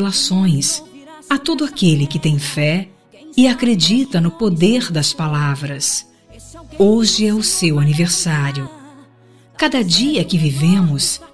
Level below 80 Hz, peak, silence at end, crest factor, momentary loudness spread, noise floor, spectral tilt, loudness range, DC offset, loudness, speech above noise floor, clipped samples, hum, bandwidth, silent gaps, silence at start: -48 dBFS; 0 dBFS; 0.05 s; 16 dB; 7 LU; -47 dBFS; -4.5 dB/octave; 1 LU; 0.9%; -16 LUFS; 32 dB; under 0.1%; none; 11 kHz; none; 0 s